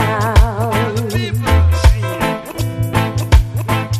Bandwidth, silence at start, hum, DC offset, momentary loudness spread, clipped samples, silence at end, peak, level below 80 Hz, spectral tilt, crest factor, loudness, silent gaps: 15 kHz; 0 s; none; under 0.1%; 6 LU; 0.3%; 0 s; 0 dBFS; -18 dBFS; -6 dB/octave; 14 dB; -16 LUFS; none